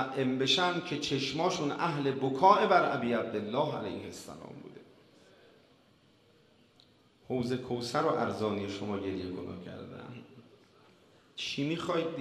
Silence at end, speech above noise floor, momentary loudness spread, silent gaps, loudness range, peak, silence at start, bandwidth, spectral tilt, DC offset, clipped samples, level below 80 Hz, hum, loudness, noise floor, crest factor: 0 s; 33 dB; 20 LU; none; 14 LU; -8 dBFS; 0 s; 13.5 kHz; -5 dB/octave; under 0.1%; under 0.1%; -70 dBFS; none; -31 LUFS; -64 dBFS; 24 dB